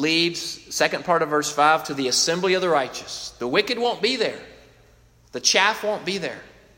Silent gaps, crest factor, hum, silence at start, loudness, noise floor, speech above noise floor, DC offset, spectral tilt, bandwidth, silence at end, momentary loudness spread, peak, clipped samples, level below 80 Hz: none; 20 dB; none; 0 s; -21 LUFS; -55 dBFS; 32 dB; under 0.1%; -2 dB/octave; 16.5 kHz; 0.3 s; 12 LU; -2 dBFS; under 0.1%; -60 dBFS